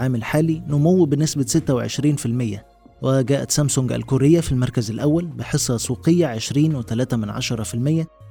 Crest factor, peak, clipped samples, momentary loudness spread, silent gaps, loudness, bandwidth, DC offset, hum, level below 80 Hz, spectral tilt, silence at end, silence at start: 16 dB; -4 dBFS; under 0.1%; 7 LU; none; -20 LUFS; 19 kHz; under 0.1%; none; -44 dBFS; -6 dB/octave; 0 s; 0 s